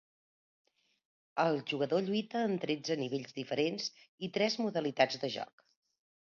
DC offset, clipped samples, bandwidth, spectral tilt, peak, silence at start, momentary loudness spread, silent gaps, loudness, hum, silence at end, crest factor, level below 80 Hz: under 0.1%; under 0.1%; 7.2 kHz; -3.5 dB/octave; -12 dBFS; 1.35 s; 9 LU; 4.09-4.18 s; -34 LUFS; none; 0.85 s; 24 dB; -82 dBFS